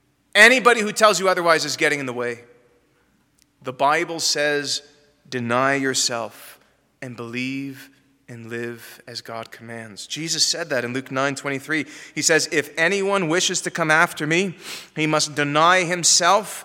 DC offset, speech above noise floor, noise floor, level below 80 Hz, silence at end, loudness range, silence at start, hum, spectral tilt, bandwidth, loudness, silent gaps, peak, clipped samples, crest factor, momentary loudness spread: under 0.1%; 42 dB; -62 dBFS; -70 dBFS; 0 s; 11 LU; 0.35 s; none; -2.5 dB/octave; 17 kHz; -19 LUFS; none; 0 dBFS; under 0.1%; 22 dB; 19 LU